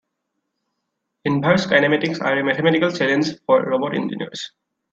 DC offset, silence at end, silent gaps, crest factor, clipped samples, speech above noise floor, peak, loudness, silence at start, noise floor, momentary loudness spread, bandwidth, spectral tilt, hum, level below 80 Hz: under 0.1%; 0.45 s; none; 20 dB; under 0.1%; 58 dB; 0 dBFS; -19 LUFS; 1.25 s; -77 dBFS; 12 LU; 7.8 kHz; -6 dB/octave; none; -62 dBFS